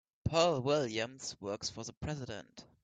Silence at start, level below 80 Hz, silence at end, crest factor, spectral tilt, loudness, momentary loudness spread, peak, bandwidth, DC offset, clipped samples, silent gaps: 0.25 s; -60 dBFS; 0.2 s; 20 dB; -4.5 dB/octave; -35 LUFS; 14 LU; -16 dBFS; 9.2 kHz; under 0.1%; under 0.1%; 1.97-2.01 s